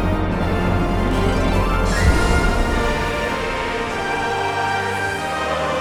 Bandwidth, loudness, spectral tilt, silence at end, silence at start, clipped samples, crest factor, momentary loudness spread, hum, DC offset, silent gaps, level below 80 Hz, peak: 15.5 kHz; -20 LUFS; -5.5 dB/octave; 0 s; 0 s; under 0.1%; 16 dB; 5 LU; none; under 0.1%; none; -24 dBFS; -4 dBFS